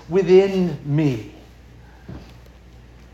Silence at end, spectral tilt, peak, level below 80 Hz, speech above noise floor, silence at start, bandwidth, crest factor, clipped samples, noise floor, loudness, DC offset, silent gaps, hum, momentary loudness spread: 0.9 s; -8 dB/octave; -4 dBFS; -46 dBFS; 27 dB; 0.1 s; 7.6 kHz; 18 dB; under 0.1%; -45 dBFS; -18 LUFS; under 0.1%; none; none; 25 LU